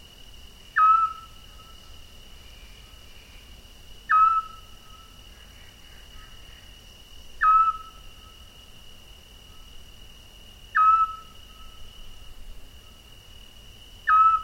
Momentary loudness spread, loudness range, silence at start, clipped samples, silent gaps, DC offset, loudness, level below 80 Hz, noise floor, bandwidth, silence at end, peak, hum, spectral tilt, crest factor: 29 LU; 4 LU; 0.75 s; under 0.1%; none; under 0.1%; -21 LUFS; -48 dBFS; -48 dBFS; 16.5 kHz; 0 s; -10 dBFS; none; -2 dB/octave; 16 dB